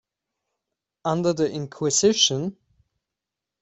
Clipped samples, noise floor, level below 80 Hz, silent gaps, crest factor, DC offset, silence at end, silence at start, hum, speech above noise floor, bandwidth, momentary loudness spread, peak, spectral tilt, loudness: under 0.1%; -86 dBFS; -64 dBFS; none; 20 dB; under 0.1%; 1.1 s; 1.05 s; none; 64 dB; 8.4 kHz; 12 LU; -6 dBFS; -3.5 dB/octave; -22 LUFS